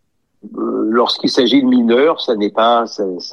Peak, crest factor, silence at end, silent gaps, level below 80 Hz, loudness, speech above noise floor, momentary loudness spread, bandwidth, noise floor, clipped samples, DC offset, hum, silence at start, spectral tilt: -2 dBFS; 14 dB; 0 s; none; -66 dBFS; -14 LUFS; 27 dB; 10 LU; 9.4 kHz; -41 dBFS; under 0.1%; 0.1%; none; 0.45 s; -4.5 dB/octave